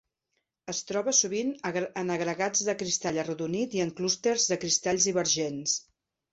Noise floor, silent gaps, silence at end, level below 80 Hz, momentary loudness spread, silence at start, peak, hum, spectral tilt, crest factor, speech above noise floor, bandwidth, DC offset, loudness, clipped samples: -80 dBFS; none; 0.5 s; -68 dBFS; 8 LU; 0.65 s; -10 dBFS; none; -2.5 dB/octave; 20 dB; 52 dB; 8.2 kHz; under 0.1%; -28 LUFS; under 0.1%